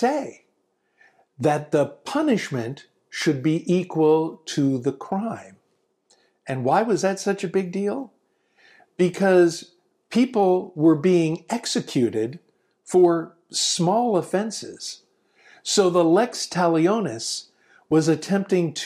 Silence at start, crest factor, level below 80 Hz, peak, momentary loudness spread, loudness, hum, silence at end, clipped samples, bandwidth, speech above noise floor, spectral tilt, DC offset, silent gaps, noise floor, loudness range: 0 s; 16 dB; -70 dBFS; -6 dBFS; 13 LU; -22 LUFS; none; 0 s; under 0.1%; 14 kHz; 49 dB; -5 dB/octave; under 0.1%; none; -70 dBFS; 4 LU